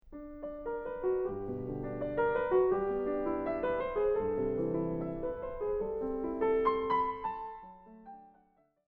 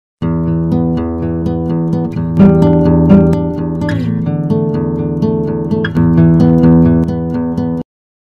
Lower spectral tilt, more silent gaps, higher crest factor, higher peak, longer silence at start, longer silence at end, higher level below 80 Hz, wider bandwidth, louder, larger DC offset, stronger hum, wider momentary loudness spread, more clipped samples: about the same, -10 dB/octave vs -10.5 dB/octave; neither; about the same, 16 dB vs 12 dB; second, -18 dBFS vs 0 dBFS; second, 0.05 s vs 0.2 s; first, 0.6 s vs 0.45 s; second, -54 dBFS vs -30 dBFS; second, 4.6 kHz vs 5.4 kHz; second, -33 LUFS vs -12 LUFS; neither; neither; first, 15 LU vs 9 LU; second, under 0.1% vs 0.7%